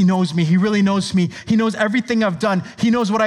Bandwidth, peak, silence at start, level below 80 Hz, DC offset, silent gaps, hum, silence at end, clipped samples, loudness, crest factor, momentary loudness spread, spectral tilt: 11 kHz; -2 dBFS; 0 s; -56 dBFS; under 0.1%; none; none; 0 s; under 0.1%; -18 LUFS; 14 dB; 4 LU; -6.5 dB/octave